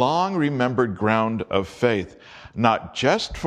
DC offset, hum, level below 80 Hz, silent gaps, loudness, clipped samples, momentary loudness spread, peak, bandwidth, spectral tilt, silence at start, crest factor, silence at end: under 0.1%; none; -48 dBFS; none; -22 LUFS; under 0.1%; 5 LU; -2 dBFS; 11 kHz; -6 dB/octave; 0 s; 20 dB; 0 s